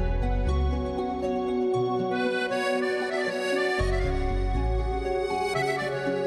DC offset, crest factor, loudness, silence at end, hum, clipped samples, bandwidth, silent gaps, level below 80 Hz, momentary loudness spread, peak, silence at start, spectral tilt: under 0.1%; 12 dB; -27 LUFS; 0 s; none; under 0.1%; 13 kHz; none; -32 dBFS; 3 LU; -14 dBFS; 0 s; -6 dB/octave